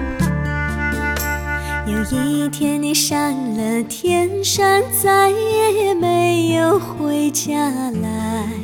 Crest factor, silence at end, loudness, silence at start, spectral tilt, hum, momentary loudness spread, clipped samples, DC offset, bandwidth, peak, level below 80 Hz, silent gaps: 14 dB; 0 s; -18 LUFS; 0 s; -4 dB/octave; none; 7 LU; under 0.1%; under 0.1%; 18 kHz; -4 dBFS; -34 dBFS; none